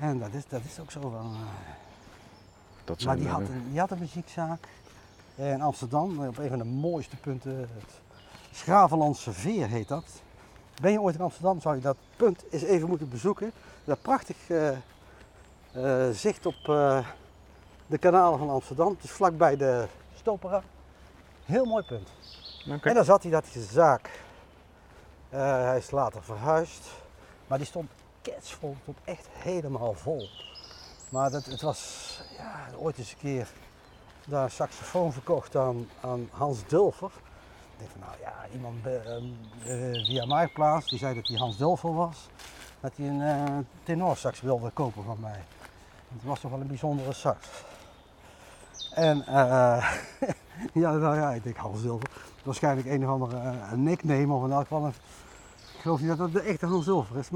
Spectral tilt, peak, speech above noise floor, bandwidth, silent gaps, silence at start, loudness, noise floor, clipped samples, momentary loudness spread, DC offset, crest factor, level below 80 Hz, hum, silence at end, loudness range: -6 dB/octave; -6 dBFS; 26 dB; 16 kHz; none; 0 s; -29 LUFS; -54 dBFS; under 0.1%; 18 LU; under 0.1%; 22 dB; -58 dBFS; none; 0 s; 9 LU